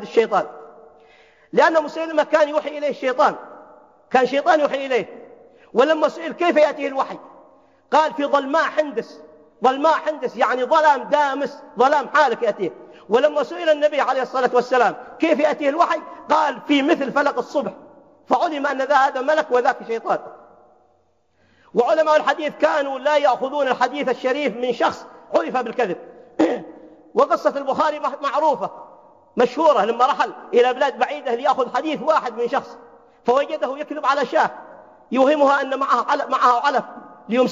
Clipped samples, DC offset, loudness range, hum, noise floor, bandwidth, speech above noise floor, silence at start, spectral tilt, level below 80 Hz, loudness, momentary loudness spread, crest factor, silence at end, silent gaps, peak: under 0.1%; under 0.1%; 3 LU; none; -63 dBFS; 7.6 kHz; 44 dB; 0 s; -4.5 dB/octave; -72 dBFS; -19 LUFS; 9 LU; 18 dB; 0 s; none; -2 dBFS